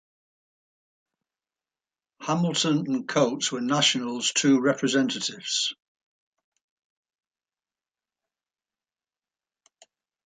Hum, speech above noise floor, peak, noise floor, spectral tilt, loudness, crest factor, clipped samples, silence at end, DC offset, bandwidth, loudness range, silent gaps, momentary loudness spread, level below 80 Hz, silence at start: none; over 66 dB; -8 dBFS; under -90 dBFS; -3.5 dB/octave; -24 LUFS; 20 dB; under 0.1%; 4.5 s; under 0.1%; 9.6 kHz; 9 LU; none; 7 LU; -76 dBFS; 2.2 s